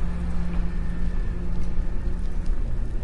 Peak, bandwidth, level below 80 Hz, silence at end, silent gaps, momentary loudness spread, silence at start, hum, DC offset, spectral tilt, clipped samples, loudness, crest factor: -12 dBFS; 5 kHz; -24 dBFS; 0 s; none; 2 LU; 0 s; none; under 0.1%; -8 dB/octave; under 0.1%; -31 LUFS; 10 dB